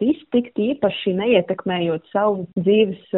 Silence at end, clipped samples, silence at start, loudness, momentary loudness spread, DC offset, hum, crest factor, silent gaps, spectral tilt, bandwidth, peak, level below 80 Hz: 0 s; under 0.1%; 0 s; -20 LUFS; 5 LU; under 0.1%; none; 16 dB; none; -5 dB/octave; 4 kHz; -2 dBFS; -60 dBFS